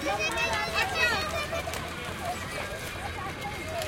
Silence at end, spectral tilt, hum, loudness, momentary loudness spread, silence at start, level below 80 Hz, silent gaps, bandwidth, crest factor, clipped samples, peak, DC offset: 0 s; -3 dB/octave; none; -30 LUFS; 10 LU; 0 s; -48 dBFS; none; 17 kHz; 20 dB; under 0.1%; -12 dBFS; under 0.1%